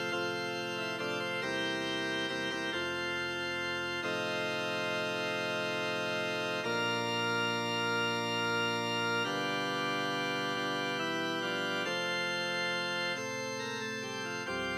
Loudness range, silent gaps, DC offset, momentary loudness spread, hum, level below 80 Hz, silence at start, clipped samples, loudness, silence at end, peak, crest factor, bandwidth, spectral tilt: 2 LU; none; under 0.1%; 4 LU; none; -74 dBFS; 0 s; under 0.1%; -33 LUFS; 0 s; -22 dBFS; 12 dB; 16 kHz; -3.5 dB/octave